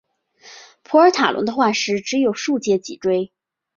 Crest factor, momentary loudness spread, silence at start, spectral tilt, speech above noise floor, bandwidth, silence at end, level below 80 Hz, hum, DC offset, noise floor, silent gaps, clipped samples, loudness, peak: 18 dB; 7 LU; 0.45 s; -4 dB/octave; 30 dB; 7.4 kHz; 0.5 s; -64 dBFS; none; under 0.1%; -48 dBFS; none; under 0.1%; -18 LUFS; -2 dBFS